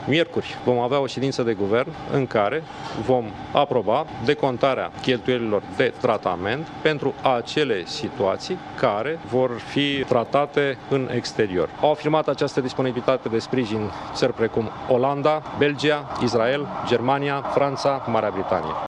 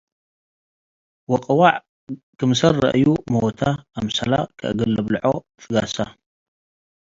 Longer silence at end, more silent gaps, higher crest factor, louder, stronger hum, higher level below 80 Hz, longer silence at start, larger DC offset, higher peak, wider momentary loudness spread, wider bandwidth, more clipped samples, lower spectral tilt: second, 0 s vs 1 s; second, none vs 1.89-2.07 s, 2.23-2.33 s; about the same, 20 dB vs 22 dB; second, -23 LUFS vs -20 LUFS; neither; about the same, -54 dBFS vs -50 dBFS; second, 0 s vs 1.3 s; neither; about the same, -2 dBFS vs 0 dBFS; second, 4 LU vs 11 LU; first, 10.5 kHz vs 7.8 kHz; neither; about the same, -6 dB/octave vs -6 dB/octave